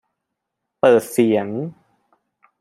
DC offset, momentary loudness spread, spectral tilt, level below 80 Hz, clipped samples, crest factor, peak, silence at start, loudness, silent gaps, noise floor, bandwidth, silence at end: under 0.1%; 13 LU; -6 dB/octave; -66 dBFS; under 0.1%; 20 dB; -2 dBFS; 0.85 s; -18 LUFS; none; -79 dBFS; 15.5 kHz; 0.9 s